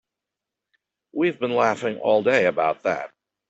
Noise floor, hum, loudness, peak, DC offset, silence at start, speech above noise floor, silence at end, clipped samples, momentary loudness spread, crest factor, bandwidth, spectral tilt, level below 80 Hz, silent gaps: -86 dBFS; none; -22 LUFS; -6 dBFS; under 0.1%; 1.15 s; 65 dB; 0.4 s; under 0.1%; 11 LU; 18 dB; 8.2 kHz; -5.5 dB/octave; -70 dBFS; none